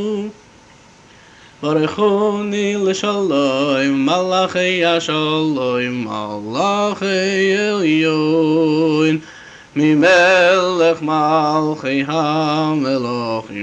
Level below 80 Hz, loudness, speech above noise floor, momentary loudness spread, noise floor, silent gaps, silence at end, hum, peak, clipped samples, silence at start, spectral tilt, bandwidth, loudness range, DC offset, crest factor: -58 dBFS; -16 LUFS; 30 dB; 8 LU; -45 dBFS; none; 0 s; none; -2 dBFS; under 0.1%; 0 s; -5 dB/octave; 8.8 kHz; 3 LU; under 0.1%; 14 dB